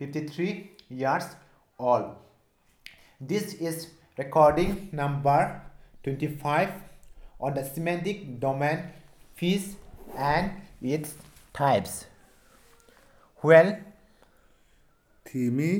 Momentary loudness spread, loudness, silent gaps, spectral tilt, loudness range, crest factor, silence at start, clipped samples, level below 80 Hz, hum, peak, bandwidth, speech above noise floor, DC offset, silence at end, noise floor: 19 LU; -27 LUFS; none; -6 dB/octave; 6 LU; 22 dB; 0 s; under 0.1%; -52 dBFS; none; -6 dBFS; 18.5 kHz; 39 dB; under 0.1%; 0 s; -65 dBFS